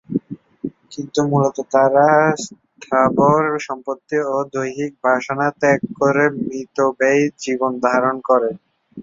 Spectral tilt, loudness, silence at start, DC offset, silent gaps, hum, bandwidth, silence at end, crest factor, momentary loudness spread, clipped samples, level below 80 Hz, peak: -6 dB/octave; -18 LUFS; 0.1 s; under 0.1%; none; none; 7.8 kHz; 0 s; 16 dB; 13 LU; under 0.1%; -60 dBFS; -2 dBFS